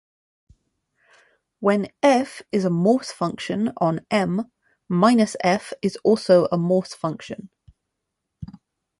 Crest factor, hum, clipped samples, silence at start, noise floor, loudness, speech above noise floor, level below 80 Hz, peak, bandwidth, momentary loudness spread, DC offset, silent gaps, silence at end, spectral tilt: 20 dB; none; under 0.1%; 1.6 s; -80 dBFS; -21 LUFS; 59 dB; -60 dBFS; -4 dBFS; 11.5 kHz; 18 LU; under 0.1%; none; 0.55 s; -6.5 dB/octave